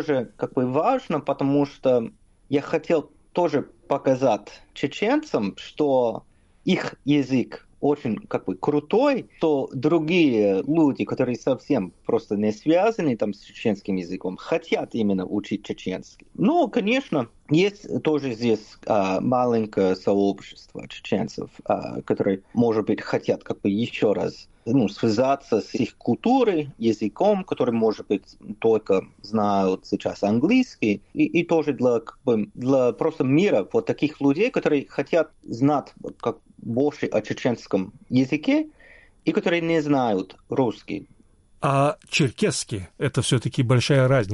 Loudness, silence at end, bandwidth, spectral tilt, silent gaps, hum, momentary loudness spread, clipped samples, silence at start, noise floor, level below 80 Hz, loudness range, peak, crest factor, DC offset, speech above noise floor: -23 LUFS; 0 s; 11.5 kHz; -6.5 dB/octave; none; none; 9 LU; under 0.1%; 0 s; -51 dBFS; -58 dBFS; 3 LU; -8 dBFS; 14 dB; under 0.1%; 29 dB